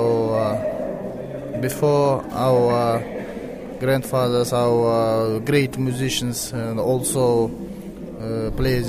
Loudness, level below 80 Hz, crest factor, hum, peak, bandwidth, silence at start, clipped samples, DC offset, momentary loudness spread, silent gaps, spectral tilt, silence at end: -21 LUFS; -40 dBFS; 14 dB; none; -6 dBFS; 16 kHz; 0 s; under 0.1%; under 0.1%; 13 LU; none; -5.5 dB/octave; 0 s